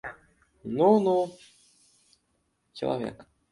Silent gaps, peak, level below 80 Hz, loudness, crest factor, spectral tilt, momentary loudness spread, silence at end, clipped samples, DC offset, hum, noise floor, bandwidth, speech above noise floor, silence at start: none; -8 dBFS; -66 dBFS; -26 LUFS; 20 dB; -7.5 dB/octave; 22 LU; 0.3 s; under 0.1%; under 0.1%; none; -74 dBFS; 11.5 kHz; 49 dB; 0.05 s